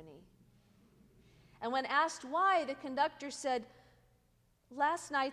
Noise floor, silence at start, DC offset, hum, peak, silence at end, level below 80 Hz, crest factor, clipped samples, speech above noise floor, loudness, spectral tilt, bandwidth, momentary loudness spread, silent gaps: -72 dBFS; 0 s; under 0.1%; none; -18 dBFS; 0 s; -74 dBFS; 20 dB; under 0.1%; 38 dB; -34 LUFS; -2.5 dB/octave; 14.5 kHz; 9 LU; none